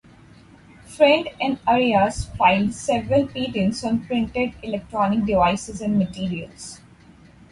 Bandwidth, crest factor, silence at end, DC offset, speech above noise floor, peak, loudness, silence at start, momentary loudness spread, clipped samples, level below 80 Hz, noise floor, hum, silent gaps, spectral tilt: 11.5 kHz; 18 dB; 0.75 s; under 0.1%; 28 dB; -4 dBFS; -21 LUFS; 0.85 s; 11 LU; under 0.1%; -44 dBFS; -49 dBFS; none; none; -5.5 dB/octave